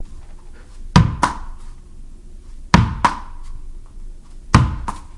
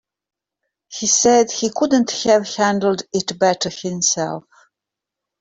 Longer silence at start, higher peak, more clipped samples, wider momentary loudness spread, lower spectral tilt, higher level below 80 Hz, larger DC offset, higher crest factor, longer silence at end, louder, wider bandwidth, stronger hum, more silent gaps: second, 0 s vs 0.9 s; about the same, 0 dBFS vs -2 dBFS; neither; first, 24 LU vs 9 LU; first, -6 dB/octave vs -3 dB/octave; first, -28 dBFS vs -60 dBFS; neither; about the same, 20 dB vs 16 dB; second, 0 s vs 1 s; about the same, -17 LUFS vs -17 LUFS; first, 11.5 kHz vs 8.4 kHz; neither; neither